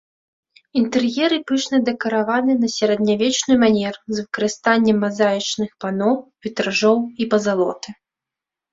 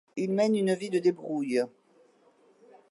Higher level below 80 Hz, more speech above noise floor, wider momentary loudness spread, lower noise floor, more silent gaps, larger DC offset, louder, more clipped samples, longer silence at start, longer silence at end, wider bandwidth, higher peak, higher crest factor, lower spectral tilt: first, -60 dBFS vs -82 dBFS; first, 68 dB vs 35 dB; about the same, 8 LU vs 6 LU; first, -87 dBFS vs -63 dBFS; neither; neither; first, -19 LUFS vs -28 LUFS; neither; first, 0.75 s vs 0.15 s; second, 0.8 s vs 1.25 s; second, 7.8 kHz vs 11.5 kHz; first, -2 dBFS vs -14 dBFS; about the same, 16 dB vs 16 dB; second, -4 dB/octave vs -6.5 dB/octave